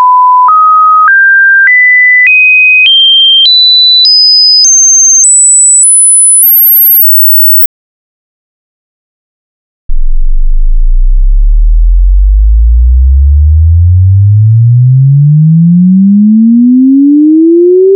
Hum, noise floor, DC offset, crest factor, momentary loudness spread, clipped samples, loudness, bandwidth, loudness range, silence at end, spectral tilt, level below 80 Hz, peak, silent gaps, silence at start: none; under -90 dBFS; under 0.1%; 4 dB; 11 LU; 0.3%; -2 LUFS; 11.5 kHz; 13 LU; 0 s; -3 dB/octave; -10 dBFS; 0 dBFS; 7.66-9.89 s; 0 s